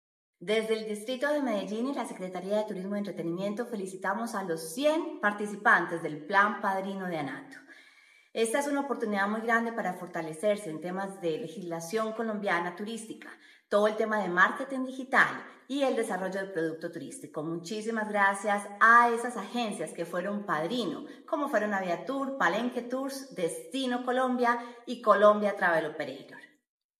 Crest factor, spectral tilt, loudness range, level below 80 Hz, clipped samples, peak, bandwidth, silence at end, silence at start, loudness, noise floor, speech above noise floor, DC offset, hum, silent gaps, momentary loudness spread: 22 dB; -4.5 dB/octave; 6 LU; -88 dBFS; under 0.1%; -8 dBFS; 15 kHz; 0.6 s; 0.4 s; -29 LUFS; -60 dBFS; 30 dB; under 0.1%; none; none; 13 LU